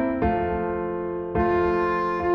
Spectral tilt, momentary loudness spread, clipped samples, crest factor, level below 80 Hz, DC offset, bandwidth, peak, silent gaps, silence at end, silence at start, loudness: -9 dB/octave; 6 LU; under 0.1%; 12 dB; -40 dBFS; under 0.1%; 6 kHz; -12 dBFS; none; 0 s; 0 s; -24 LUFS